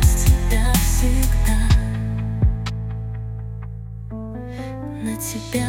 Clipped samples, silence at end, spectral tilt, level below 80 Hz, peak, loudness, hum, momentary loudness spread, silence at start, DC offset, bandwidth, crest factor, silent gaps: under 0.1%; 0 s; -5 dB/octave; -22 dBFS; -2 dBFS; -22 LUFS; none; 14 LU; 0 s; under 0.1%; 17 kHz; 16 dB; none